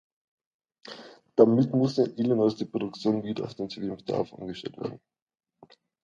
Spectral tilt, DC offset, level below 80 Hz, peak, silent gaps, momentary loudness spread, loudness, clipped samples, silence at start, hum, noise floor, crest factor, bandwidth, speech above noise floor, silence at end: -8 dB/octave; under 0.1%; -68 dBFS; -4 dBFS; none; 17 LU; -27 LUFS; under 0.1%; 0.85 s; none; -58 dBFS; 24 dB; 7.6 kHz; 31 dB; 1.05 s